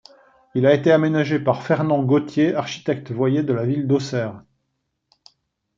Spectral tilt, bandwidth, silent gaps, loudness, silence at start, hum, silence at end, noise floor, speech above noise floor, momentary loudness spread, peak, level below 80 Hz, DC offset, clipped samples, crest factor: -7.5 dB/octave; 7.6 kHz; none; -20 LUFS; 0.55 s; none; 1.4 s; -75 dBFS; 55 dB; 9 LU; -2 dBFS; -62 dBFS; under 0.1%; under 0.1%; 18 dB